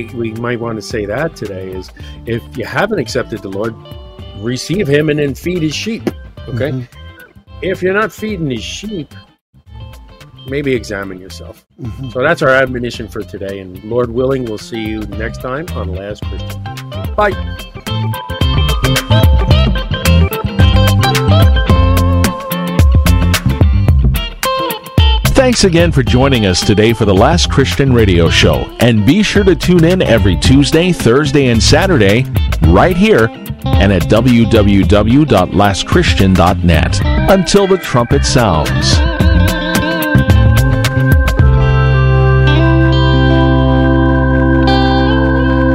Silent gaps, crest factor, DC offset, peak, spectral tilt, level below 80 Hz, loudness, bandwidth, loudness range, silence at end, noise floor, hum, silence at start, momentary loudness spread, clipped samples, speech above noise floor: 9.41-9.53 s; 12 dB; under 0.1%; 0 dBFS; -6 dB/octave; -20 dBFS; -11 LUFS; 16 kHz; 10 LU; 0 s; -35 dBFS; none; 0 s; 14 LU; under 0.1%; 24 dB